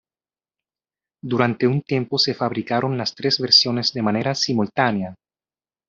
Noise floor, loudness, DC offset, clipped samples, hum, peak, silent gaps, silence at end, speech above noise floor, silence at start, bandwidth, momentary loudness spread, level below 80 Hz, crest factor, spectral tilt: under -90 dBFS; -20 LUFS; under 0.1%; under 0.1%; none; -2 dBFS; none; 0.75 s; over 70 dB; 1.25 s; 7.8 kHz; 11 LU; -62 dBFS; 20 dB; -4.5 dB/octave